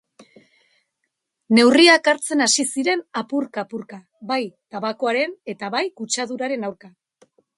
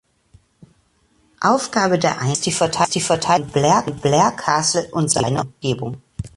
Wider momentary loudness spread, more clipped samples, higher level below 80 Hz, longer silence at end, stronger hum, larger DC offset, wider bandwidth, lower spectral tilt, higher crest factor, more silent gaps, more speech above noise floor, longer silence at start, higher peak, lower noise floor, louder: first, 19 LU vs 7 LU; neither; second, -72 dBFS vs -48 dBFS; first, 0.7 s vs 0.1 s; neither; neither; about the same, 11.5 kHz vs 11.5 kHz; second, -2.5 dB/octave vs -4 dB/octave; about the same, 22 dB vs 18 dB; neither; first, 57 dB vs 42 dB; about the same, 1.5 s vs 1.4 s; about the same, 0 dBFS vs -2 dBFS; first, -77 dBFS vs -60 dBFS; about the same, -19 LUFS vs -18 LUFS